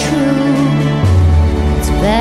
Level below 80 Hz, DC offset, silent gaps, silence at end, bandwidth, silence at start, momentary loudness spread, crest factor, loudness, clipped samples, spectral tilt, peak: -20 dBFS; under 0.1%; none; 0 s; 13.5 kHz; 0 s; 3 LU; 10 dB; -13 LUFS; under 0.1%; -6.5 dB/octave; -2 dBFS